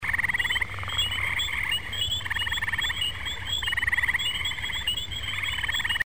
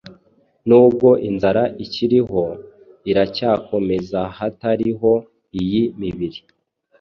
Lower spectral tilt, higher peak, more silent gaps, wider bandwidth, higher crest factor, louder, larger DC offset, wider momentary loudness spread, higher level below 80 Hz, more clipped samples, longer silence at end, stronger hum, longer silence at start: second, -1 dB/octave vs -8.5 dB/octave; second, -14 dBFS vs -2 dBFS; neither; first, over 20 kHz vs 6.4 kHz; about the same, 14 dB vs 16 dB; second, -26 LUFS vs -18 LUFS; first, 0.9% vs under 0.1%; second, 4 LU vs 14 LU; first, -44 dBFS vs -50 dBFS; neither; second, 0 s vs 0.6 s; neither; about the same, 0 s vs 0.05 s